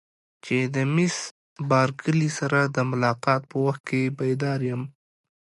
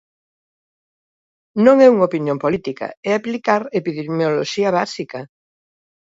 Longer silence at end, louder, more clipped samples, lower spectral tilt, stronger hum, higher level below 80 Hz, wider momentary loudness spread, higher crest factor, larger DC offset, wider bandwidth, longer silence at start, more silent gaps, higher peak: second, 0.5 s vs 0.85 s; second, -24 LUFS vs -17 LUFS; neither; about the same, -6 dB/octave vs -6 dB/octave; neither; about the same, -66 dBFS vs -62 dBFS; second, 10 LU vs 16 LU; about the same, 16 dB vs 18 dB; neither; first, 11.5 kHz vs 7.8 kHz; second, 0.45 s vs 1.55 s; first, 1.31-1.56 s, 3.80-3.84 s vs 2.97-3.03 s; second, -8 dBFS vs 0 dBFS